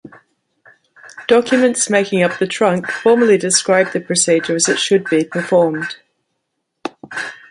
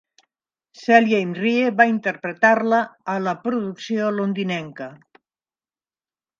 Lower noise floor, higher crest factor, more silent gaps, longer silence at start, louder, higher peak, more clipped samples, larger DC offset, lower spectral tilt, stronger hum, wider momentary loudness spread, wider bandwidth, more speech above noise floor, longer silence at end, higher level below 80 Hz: second, -73 dBFS vs under -90 dBFS; second, 16 dB vs 22 dB; neither; first, 1.05 s vs 0.8 s; first, -15 LUFS vs -20 LUFS; about the same, 0 dBFS vs 0 dBFS; neither; neither; second, -3.5 dB/octave vs -6 dB/octave; neither; about the same, 14 LU vs 12 LU; first, 11.5 kHz vs 7.2 kHz; second, 59 dB vs over 70 dB; second, 0.15 s vs 1.45 s; first, -64 dBFS vs -74 dBFS